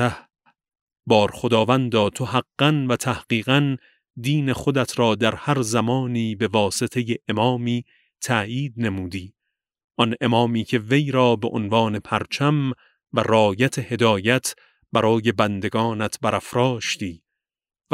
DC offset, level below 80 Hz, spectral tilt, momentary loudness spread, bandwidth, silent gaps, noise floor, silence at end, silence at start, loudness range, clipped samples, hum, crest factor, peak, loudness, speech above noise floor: under 0.1%; -56 dBFS; -5.5 dB/octave; 8 LU; 16 kHz; 0.81-0.87 s, 4.10-4.14 s, 9.84-9.88 s; -84 dBFS; 0.75 s; 0 s; 3 LU; under 0.1%; none; 20 dB; -2 dBFS; -21 LUFS; 63 dB